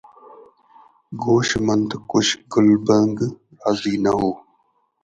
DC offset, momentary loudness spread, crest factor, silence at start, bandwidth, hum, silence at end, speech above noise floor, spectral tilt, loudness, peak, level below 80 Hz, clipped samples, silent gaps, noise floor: under 0.1%; 11 LU; 18 dB; 1.1 s; 9 kHz; none; 0.65 s; 46 dB; -5 dB/octave; -19 LUFS; -4 dBFS; -52 dBFS; under 0.1%; none; -65 dBFS